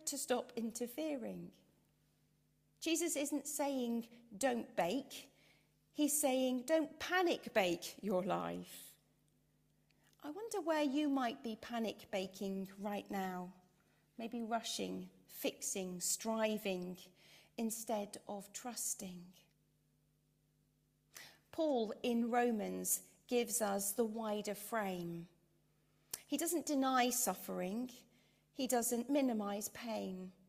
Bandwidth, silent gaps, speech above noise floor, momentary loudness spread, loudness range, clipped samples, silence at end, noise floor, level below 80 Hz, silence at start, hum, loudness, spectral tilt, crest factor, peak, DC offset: 15.5 kHz; none; 38 dB; 15 LU; 7 LU; under 0.1%; 0.15 s; -77 dBFS; -80 dBFS; 0 s; none; -39 LUFS; -3.5 dB/octave; 22 dB; -20 dBFS; under 0.1%